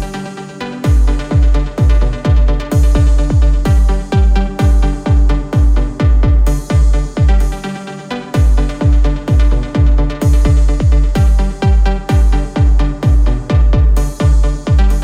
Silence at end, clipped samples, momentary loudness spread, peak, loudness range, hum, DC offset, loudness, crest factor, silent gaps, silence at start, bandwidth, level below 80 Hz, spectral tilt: 0 s; under 0.1%; 3 LU; 0 dBFS; 2 LU; none; under 0.1%; -13 LUFS; 10 dB; none; 0 s; 10.5 kHz; -12 dBFS; -7.5 dB/octave